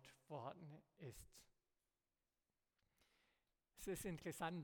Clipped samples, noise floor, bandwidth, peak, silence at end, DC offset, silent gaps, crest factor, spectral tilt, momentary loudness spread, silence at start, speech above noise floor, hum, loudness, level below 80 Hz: under 0.1%; under -90 dBFS; 18 kHz; -32 dBFS; 0 s; under 0.1%; none; 22 dB; -5 dB/octave; 15 LU; 0 s; over 38 dB; none; -53 LUFS; -74 dBFS